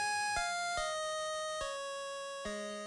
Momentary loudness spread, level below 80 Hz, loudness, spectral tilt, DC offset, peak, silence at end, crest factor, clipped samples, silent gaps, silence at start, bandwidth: 7 LU; -60 dBFS; -37 LUFS; -1 dB/octave; under 0.1%; -22 dBFS; 0 s; 16 dB; under 0.1%; none; 0 s; 13.5 kHz